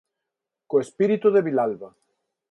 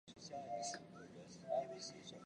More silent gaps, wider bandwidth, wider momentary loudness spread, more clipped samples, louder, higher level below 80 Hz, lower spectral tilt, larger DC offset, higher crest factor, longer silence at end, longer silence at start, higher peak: neither; about the same, 9.4 kHz vs 10 kHz; second, 8 LU vs 13 LU; neither; first, -22 LUFS vs -48 LUFS; first, -72 dBFS vs -82 dBFS; first, -7.5 dB/octave vs -3 dB/octave; neither; about the same, 16 dB vs 18 dB; first, 0.65 s vs 0 s; first, 0.7 s vs 0.05 s; first, -8 dBFS vs -30 dBFS